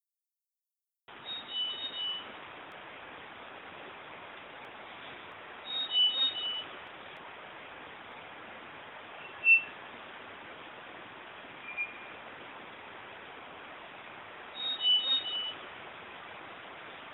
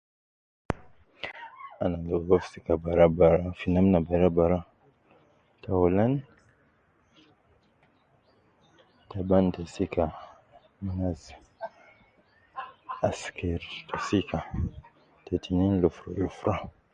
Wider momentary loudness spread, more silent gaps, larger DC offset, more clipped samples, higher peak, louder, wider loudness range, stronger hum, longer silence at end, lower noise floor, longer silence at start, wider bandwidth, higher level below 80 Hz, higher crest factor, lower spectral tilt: about the same, 21 LU vs 19 LU; neither; neither; neither; second, -14 dBFS vs -6 dBFS; about the same, -29 LUFS vs -27 LUFS; about the same, 12 LU vs 11 LU; neither; second, 0 s vs 0.25 s; first, under -90 dBFS vs -66 dBFS; first, 1.1 s vs 0.7 s; second, 5.6 kHz vs 9.2 kHz; second, -76 dBFS vs -44 dBFS; about the same, 24 dB vs 22 dB; second, -4 dB/octave vs -8 dB/octave